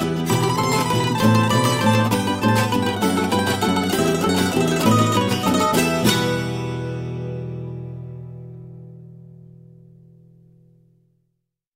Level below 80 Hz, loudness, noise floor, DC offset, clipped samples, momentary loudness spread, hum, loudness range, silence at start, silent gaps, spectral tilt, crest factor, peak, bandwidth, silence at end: -48 dBFS; -19 LUFS; -75 dBFS; under 0.1%; under 0.1%; 17 LU; none; 16 LU; 0 s; none; -5 dB/octave; 18 dB; -4 dBFS; 16 kHz; 2.55 s